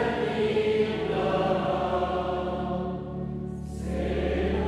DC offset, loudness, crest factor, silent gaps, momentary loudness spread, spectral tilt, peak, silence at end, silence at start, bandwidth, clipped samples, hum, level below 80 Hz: under 0.1%; -28 LUFS; 14 dB; none; 9 LU; -7 dB/octave; -12 dBFS; 0 s; 0 s; 11.5 kHz; under 0.1%; none; -40 dBFS